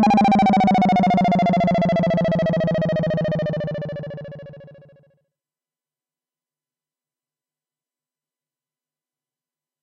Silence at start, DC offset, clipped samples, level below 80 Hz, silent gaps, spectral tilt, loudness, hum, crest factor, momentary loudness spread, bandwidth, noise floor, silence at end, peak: 0 s; under 0.1%; under 0.1%; -50 dBFS; none; -8 dB/octave; -19 LUFS; none; 10 dB; 16 LU; 8 kHz; under -90 dBFS; 5.1 s; -12 dBFS